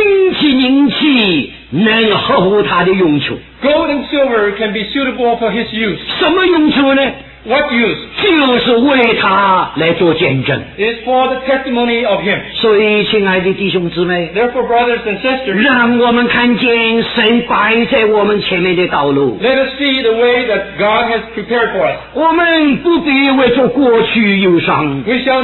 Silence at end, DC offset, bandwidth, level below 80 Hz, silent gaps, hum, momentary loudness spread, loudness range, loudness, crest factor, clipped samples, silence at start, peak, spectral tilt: 0 s; under 0.1%; 4.3 kHz; -42 dBFS; none; none; 6 LU; 2 LU; -11 LUFS; 12 dB; under 0.1%; 0 s; 0 dBFS; -8.5 dB/octave